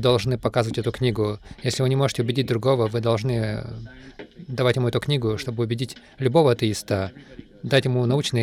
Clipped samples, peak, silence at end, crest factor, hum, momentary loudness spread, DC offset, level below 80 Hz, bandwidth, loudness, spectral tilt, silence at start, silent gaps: under 0.1%; -6 dBFS; 0 s; 16 dB; none; 13 LU; under 0.1%; -48 dBFS; 14.5 kHz; -23 LUFS; -6 dB/octave; 0 s; none